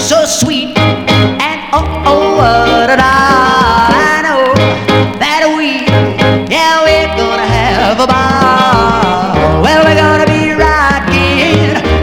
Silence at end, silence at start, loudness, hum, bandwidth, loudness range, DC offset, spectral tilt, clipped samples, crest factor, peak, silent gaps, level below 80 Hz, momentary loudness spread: 0 s; 0 s; -9 LUFS; none; 18 kHz; 1 LU; under 0.1%; -4.5 dB/octave; 0.7%; 8 dB; 0 dBFS; none; -24 dBFS; 4 LU